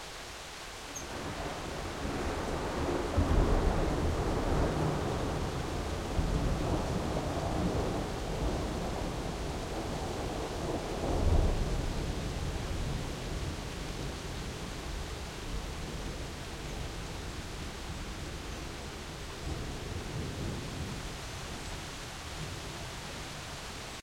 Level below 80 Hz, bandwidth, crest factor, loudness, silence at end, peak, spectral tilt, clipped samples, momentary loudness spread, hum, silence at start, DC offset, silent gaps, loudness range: -38 dBFS; 16 kHz; 20 dB; -36 LUFS; 0 s; -14 dBFS; -5 dB/octave; under 0.1%; 10 LU; none; 0 s; under 0.1%; none; 8 LU